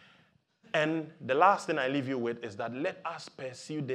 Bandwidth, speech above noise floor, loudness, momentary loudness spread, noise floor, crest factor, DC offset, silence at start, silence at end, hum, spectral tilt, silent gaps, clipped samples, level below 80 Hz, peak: 11.5 kHz; 36 dB; -31 LUFS; 15 LU; -67 dBFS; 22 dB; under 0.1%; 0.75 s; 0 s; none; -5.5 dB/octave; none; under 0.1%; -84 dBFS; -10 dBFS